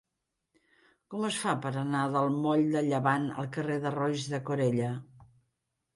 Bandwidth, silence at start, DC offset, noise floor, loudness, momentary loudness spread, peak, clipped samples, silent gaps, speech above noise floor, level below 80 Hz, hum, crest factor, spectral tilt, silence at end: 11.5 kHz; 1.1 s; under 0.1%; -84 dBFS; -30 LUFS; 7 LU; -12 dBFS; under 0.1%; none; 55 dB; -72 dBFS; none; 20 dB; -6 dB/octave; 0.7 s